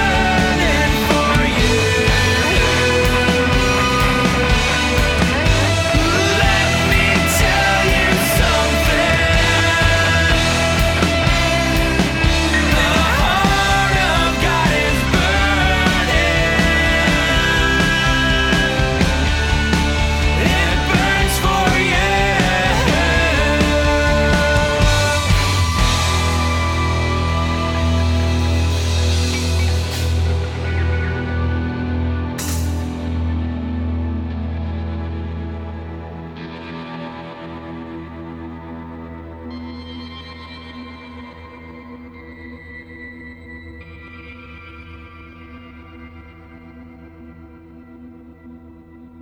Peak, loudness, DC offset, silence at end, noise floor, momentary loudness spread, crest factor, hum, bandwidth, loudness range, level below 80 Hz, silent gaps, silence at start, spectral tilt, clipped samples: 0 dBFS; -16 LUFS; under 0.1%; 0 s; -41 dBFS; 20 LU; 16 dB; none; 18 kHz; 20 LU; -24 dBFS; none; 0 s; -4.5 dB/octave; under 0.1%